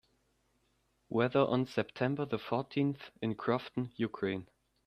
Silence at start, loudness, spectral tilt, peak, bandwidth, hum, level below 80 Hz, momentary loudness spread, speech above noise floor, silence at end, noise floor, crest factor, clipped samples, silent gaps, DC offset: 1.1 s; -34 LUFS; -8 dB/octave; -14 dBFS; 12.5 kHz; none; -70 dBFS; 8 LU; 42 dB; 0.4 s; -75 dBFS; 20 dB; under 0.1%; none; under 0.1%